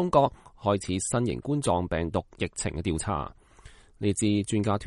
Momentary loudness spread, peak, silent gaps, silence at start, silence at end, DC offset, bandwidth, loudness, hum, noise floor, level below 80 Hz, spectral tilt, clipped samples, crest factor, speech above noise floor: 6 LU; -8 dBFS; none; 0 s; 0 s; under 0.1%; 11.5 kHz; -28 LUFS; none; -52 dBFS; -46 dBFS; -5.5 dB/octave; under 0.1%; 20 dB; 25 dB